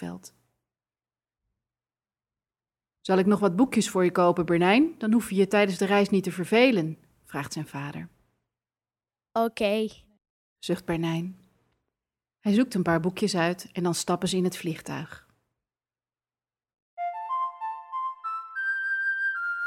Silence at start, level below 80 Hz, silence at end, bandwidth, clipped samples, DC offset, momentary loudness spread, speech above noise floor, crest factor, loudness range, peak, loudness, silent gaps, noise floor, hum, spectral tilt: 0 s; -64 dBFS; 0 s; 16 kHz; under 0.1%; under 0.1%; 14 LU; over 65 dB; 20 dB; 11 LU; -8 dBFS; -26 LUFS; 10.30-10.56 s, 16.82-16.97 s; under -90 dBFS; none; -5.5 dB/octave